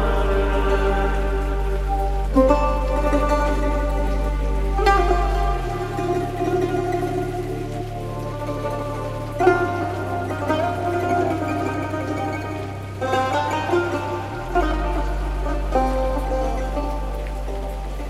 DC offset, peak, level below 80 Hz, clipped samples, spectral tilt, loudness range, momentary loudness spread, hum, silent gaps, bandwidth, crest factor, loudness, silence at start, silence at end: under 0.1%; -4 dBFS; -26 dBFS; under 0.1%; -6.5 dB/octave; 4 LU; 10 LU; none; none; 13.5 kHz; 18 dB; -23 LUFS; 0 s; 0 s